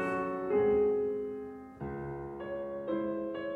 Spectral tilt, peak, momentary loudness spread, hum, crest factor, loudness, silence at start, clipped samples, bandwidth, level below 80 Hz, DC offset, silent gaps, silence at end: -8.5 dB/octave; -18 dBFS; 14 LU; none; 14 dB; -34 LUFS; 0 s; under 0.1%; 4.2 kHz; -58 dBFS; under 0.1%; none; 0 s